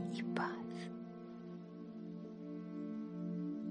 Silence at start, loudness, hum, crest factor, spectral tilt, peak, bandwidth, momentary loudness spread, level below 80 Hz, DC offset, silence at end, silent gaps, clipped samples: 0 s; -45 LUFS; none; 20 dB; -7.5 dB/octave; -24 dBFS; 9.6 kHz; 10 LU; -82 dBFS; under 0.1%; 0 s; none; under 0.1%